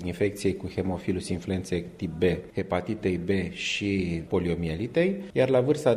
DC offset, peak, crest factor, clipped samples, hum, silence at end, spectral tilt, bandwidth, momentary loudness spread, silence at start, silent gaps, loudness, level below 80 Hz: under 0.1%; -10 dBFS; 18 dB; under 0.1%; none; 0 s; -6 dB/octave; 14 kHz; 7 LU; 0 s; none; -28 LUFS; -50 dBFS